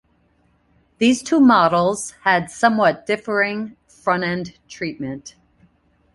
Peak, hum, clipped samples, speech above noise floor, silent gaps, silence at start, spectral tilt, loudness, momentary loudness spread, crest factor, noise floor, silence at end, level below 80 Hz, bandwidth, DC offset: -2 dBFS; none; under 0.1%; 42 dB; none; 1 s; -4.5 dB/octave; -19 LUFS; 16 LU; 18 dB; -61 dBFS; 0.85 s; -58 dBFS; 11.5 kHz; under 0.1%